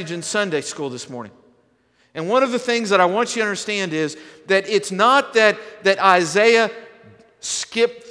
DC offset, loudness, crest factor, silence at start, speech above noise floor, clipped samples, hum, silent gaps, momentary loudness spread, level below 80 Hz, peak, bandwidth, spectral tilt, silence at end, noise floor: under 0.1%; -18 LUFS; 20 dB; 0 s; 42 dB; under 0.1%; none; none; 16 LU; -70 dBFS; 0 dBFS; 11 kHz; -3 dB/octave; 0 s; -61 dBFS